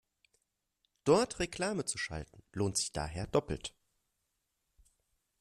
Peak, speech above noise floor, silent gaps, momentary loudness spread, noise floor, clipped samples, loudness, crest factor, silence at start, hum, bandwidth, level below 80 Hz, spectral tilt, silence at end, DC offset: -14 dBFS; 49 dB; none; 13 LU; -83 dBFS; under 0.1%; -34 LUFS; 24 dB; 1.05 s; none; 13.5 kHz; -56 dBFS; -4 dB/octave; 1.7 s; under 0.1%